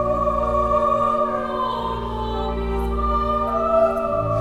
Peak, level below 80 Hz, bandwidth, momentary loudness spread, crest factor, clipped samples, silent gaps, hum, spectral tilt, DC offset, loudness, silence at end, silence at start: -8 dBFS; -30 dBFS; 13 kHz; 7 LU; 14 dB; under 0.1%; none; none; -7.5 dB/octave; under 0.1%; -21 LUFS; 0 s; 0 s